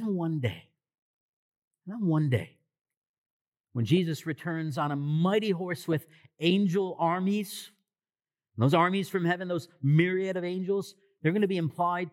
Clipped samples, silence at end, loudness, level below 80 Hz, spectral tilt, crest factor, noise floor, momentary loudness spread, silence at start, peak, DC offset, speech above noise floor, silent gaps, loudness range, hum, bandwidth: under 0.1%; 0 s; -29 LUFS; -84 dBFS; -7 dB/octave; 20 dB; under -90 dBFS; 10 LU; 0 s; -10 dBFS; under 0.1%; over 62 dB; 1.02-1.71 s, 2.81-2.85 s, 2.97-3.52 s, 3.60-3.64 s; 5 LU; none; 16 kHz